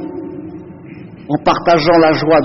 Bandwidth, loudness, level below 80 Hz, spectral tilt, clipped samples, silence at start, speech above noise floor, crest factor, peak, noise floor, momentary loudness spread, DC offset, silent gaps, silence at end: 6.2 kHz; -12 LUFS; -44 dBFS; -6.5 dB/octave; under 0.1%; 0 s; 22 dB; 12 dB; -2 dBFS; -33 dBFS; 23 LU; under 0.1%; none; 0 s